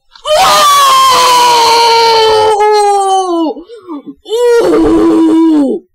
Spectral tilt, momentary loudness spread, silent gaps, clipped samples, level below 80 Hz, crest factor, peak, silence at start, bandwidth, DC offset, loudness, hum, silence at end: -2.5 dB/octave; 13 LU; none; under 0.1%; -38 dBFS; 8 dB; 0 dBFS; 0.25 s; 16 kHz; under 0.1%; -7 LUFS; none; 0.15 s